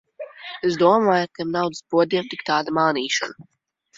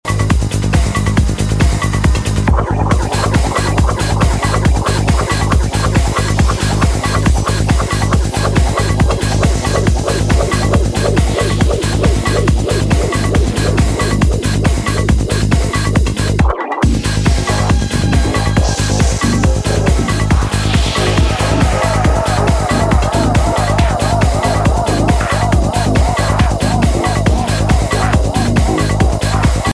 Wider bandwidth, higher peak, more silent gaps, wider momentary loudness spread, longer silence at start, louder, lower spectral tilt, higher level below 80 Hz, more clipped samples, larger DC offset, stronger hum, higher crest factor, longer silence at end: second, 7.8 kHz vs 11 kHz; second, -4 dBFS vs 0 dBFS; neither; first, 14 LU vs 1 LU; first, 0.2 s vs 0.05 s; second, -21 LUFS vs -14 LUFS; about the same, -4.5 dB/octave vs -5.5 dB/octave; second, -66 dBFS vs -18 dBFS; neither; neither; neither; first, 18 dB vs 12 dB; first, 0.55 s vs 0 s